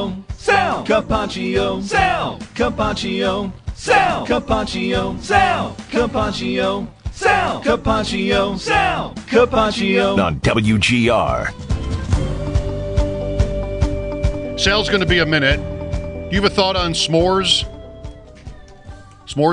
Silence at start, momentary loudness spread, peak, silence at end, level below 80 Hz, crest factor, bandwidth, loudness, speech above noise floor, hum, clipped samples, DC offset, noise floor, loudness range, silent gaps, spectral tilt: 0 s; 9 LU; -2 dBFS; 0 s; -30 dBFS; 16 dB; 10.5 kHz; -18 LUFS; 21 dB; none; under 0.1%; under 0.1%; -38 dBFS; 3 LU; none; -5 dB/octave